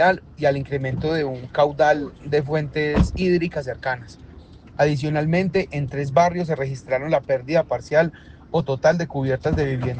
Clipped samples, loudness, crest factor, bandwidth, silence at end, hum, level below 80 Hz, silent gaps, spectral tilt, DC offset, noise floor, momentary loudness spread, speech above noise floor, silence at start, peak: under 0.1%; -22 LUFS; 18 dB; 9 kHz; 0 s; none; -38 dBFS; none; -7 dB/octave; under 0.1%; -43 dBFS; 7 LU; 22 dB; 0 s; -4 dBFS